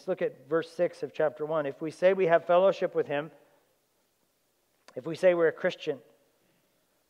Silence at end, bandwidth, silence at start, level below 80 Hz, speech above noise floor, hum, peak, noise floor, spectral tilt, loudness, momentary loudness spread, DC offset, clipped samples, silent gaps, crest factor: 1.1 s; 11 kHz; 0.05 s; -88 dBFS; 45 dB; none; -10 dBFS; -73 dBFS; -6 dB/octave; -28 LUFS; 14 LU; under 0.1%; under 0.1%; none; 20 dB